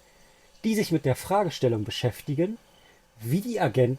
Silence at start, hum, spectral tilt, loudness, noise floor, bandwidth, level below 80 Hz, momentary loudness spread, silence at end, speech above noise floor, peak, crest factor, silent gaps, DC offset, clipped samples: 0.65 s; none; -6 dB/octave; -27 LUFS; -58 dBFS; 16.5 kHz; -60 dBFS; 6 LU; 0 s; 32 dB; -10 dBFS; 16 dB; none; under 0.1%; under 0.1%